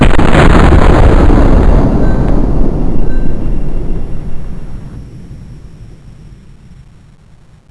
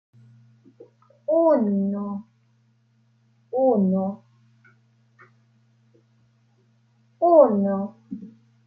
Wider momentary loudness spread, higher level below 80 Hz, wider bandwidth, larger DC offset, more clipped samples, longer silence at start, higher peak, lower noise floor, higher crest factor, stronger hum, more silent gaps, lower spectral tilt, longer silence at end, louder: about the same, 23 LU vs 22 LU; first, -12 dBFS vs -76 dBFS; first, 9.8 kHz vs 4.8 kHz; neither; first, 3% vs under 0.1%; second, 0 s vs 1.3 s; first, 0 dBFS vs -4 dBFS; second, -36 dBFS vs -63 dBFS; second, 8 dB vs 22 dB; neither; neither; second, -7.5 dB/octave vs -12.5 dB/octave; first, 0.95 s vs 0.4 s; first, -11 LUFS vs -21 LUFS